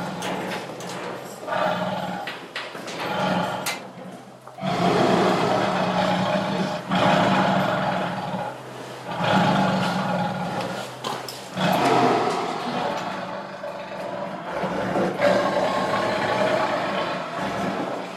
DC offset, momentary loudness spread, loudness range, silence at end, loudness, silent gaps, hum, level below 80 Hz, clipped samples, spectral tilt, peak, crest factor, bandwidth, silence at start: under 0.1%; 13 LU; 6 LU; 0 s; -24 LUFS; none; none; -58 dBFS; under 0.1%; -5.5 dB/octave; -6 dBFS; 18 dB; 15 kHz; 0 s